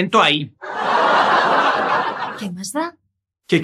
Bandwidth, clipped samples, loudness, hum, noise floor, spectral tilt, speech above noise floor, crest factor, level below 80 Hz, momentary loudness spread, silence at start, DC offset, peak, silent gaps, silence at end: 14.5 kHz; under 0.1%; -17 LUFS; none; -45 dBFS; -4 dB/octave; 26 dB; 16 dB; -68 dBFS; 12 LU; 0 s; under 0.1%; -2 dBFS; none; 0 s